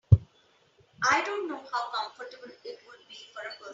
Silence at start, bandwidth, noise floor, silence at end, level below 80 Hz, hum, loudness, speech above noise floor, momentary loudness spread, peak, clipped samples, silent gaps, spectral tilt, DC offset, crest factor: 0.1 s; 7.6 kHz; -65 dBFS; 0 s; -46 dBFS; none; -29 LUFS; 31 dB; 21 LU; -4 dBFS; under 0.1%; none; -5 dB/octave; under 0.1%; 26 dB